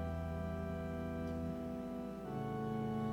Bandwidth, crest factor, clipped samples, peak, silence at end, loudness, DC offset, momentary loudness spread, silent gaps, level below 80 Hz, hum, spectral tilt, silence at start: 16.5 kHz; 12 dB; under 0.1%; -28 dBFS; 0 s; -42 LUFS; under 0.1%; 4 LU; none; -52 dBFS; none; -8.5 dB/octave; 0 s